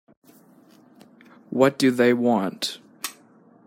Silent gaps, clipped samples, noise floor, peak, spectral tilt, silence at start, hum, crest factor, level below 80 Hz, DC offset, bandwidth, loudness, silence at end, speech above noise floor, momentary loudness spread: none; under 0.1%; -54 dBFS; -4 dBFS; -5 dB/octave; 1.5 s; none; 20 dB; -72 dBFS; under 0.1%; 16.5 kHz; -22 LUFS; 0.55 s; 34 dB; 16 LU